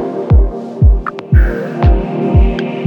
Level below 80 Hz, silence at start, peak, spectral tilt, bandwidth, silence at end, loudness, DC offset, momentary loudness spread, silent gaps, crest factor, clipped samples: -14 dBFS; 0 s; 0 dBFS; -9.5 dB/octave; 5.2 kHz; 0 s; -13 LUFS; under 0.1%; 4 LU; none; 10 dB; under 0.1%